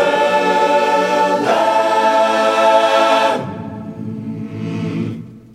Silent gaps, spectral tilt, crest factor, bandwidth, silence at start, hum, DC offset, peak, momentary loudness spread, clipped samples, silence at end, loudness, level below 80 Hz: none; -4.5 dB/octave; 16 dB; 15.5 kHz; 0 s; 60 Hz at -50 dBFS; under 0.1%; 0 dBFS; 15 LU; under 0.1%; 0.15 s; -14 LUFS; -60 dBFS